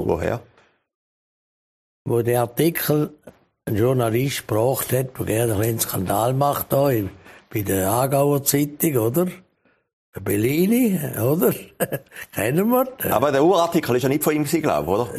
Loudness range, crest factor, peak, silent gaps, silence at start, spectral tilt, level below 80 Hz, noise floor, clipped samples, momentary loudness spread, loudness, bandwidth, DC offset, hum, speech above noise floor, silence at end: 3 LU; 20 dB; -2 dBFS; 0.95-2.05 s, 9.93-10.13 s; 0 s; -5.5 dB/octave; -52 dBFS; under -90 dBFS; under 0.1%; 9 LU; -21 LUFS; 15.5 kHz; under 0.1%; none; over 70 dB; 0 s